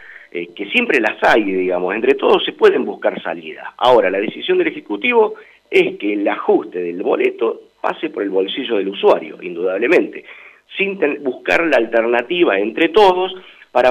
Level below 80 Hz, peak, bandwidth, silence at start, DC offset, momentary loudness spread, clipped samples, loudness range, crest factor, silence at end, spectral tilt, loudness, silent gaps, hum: -56 dBFS; -2 dBFS; 10 kHz; 0 s; under 0.1%; 12 LU; under 0.1%; 3 LU; 14 dB; 0 s; -5 dB/octave; -16 LUFS; none; none